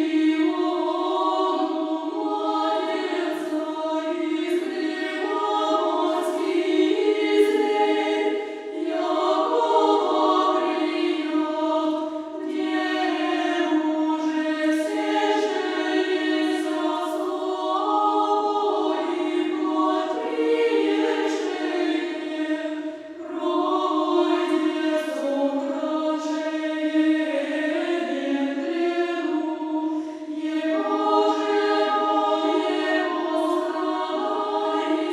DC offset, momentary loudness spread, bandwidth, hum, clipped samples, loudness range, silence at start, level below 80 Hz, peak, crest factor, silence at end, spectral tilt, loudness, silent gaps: under 0.1%; 6 LU; 12 kHz; none; under 0.1%; 3 LU; 0 s; -76 dBFS; -6 dBFS; 16 dB; 0 s; -2.5 dB/octave; -23 LUFS; none